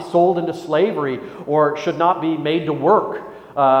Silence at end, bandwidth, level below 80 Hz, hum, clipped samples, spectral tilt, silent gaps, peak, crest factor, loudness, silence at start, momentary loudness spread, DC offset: 0 s; 10 kHz; -62 dBFS; none; under 0.1%; -7 dB/octave; none; -2 dBFS; 16 dB; -19 LUFS; 0 s; 10 LU; under 0.1%